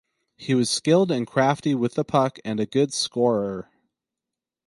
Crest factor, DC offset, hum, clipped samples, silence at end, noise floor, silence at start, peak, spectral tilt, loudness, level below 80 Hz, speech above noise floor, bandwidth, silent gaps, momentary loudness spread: 18 dB; under 0.1%; none; under 0.1%; 1.05 s; -87 dBFS; 0.4 s; -4 dBFS; -5 dB/octave; -23 LUFS; -64 dBFS; 65 dB; 11.5 kHz; none; 8 LU